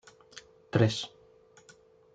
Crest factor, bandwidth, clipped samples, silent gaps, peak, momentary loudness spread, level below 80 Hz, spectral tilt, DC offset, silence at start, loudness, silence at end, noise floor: 24 dB; 9.2 kHz; under 0.1%; none; -10 dBFS; 24 LU; -68 dBFS; -6 dB/octave; under 0.1%; 0.35 s; -30 LUFS; 1.05 s; -59 dBFS